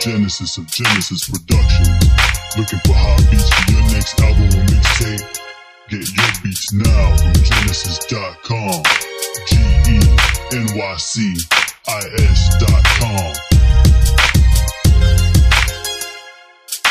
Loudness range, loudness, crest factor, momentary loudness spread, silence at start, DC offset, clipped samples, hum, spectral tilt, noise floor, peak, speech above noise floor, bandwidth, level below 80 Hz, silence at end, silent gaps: 3 LU; -14 LUFS; 12 dB; 10 LU; 0 s; under 0.1%; under 0.1%; none; -4 dB/octave; -39 dBFS; 0 dBFS; 27 dB; 15.5 kHz; -16 dBFS; 0 s; none